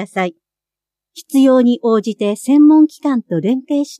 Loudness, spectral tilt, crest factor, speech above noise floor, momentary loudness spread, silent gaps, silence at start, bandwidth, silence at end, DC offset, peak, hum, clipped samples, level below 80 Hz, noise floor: -14 LUFS; -6.5 dB/octave; 12 dB; 73 dB; 10 LU; none; 0 s; 13.5 kHz; 0.05 s; under 0.1%; -2 dBFS; 50 Hz at -70 dBFS; under 0.1%; -74 dBFS; -87 dBFS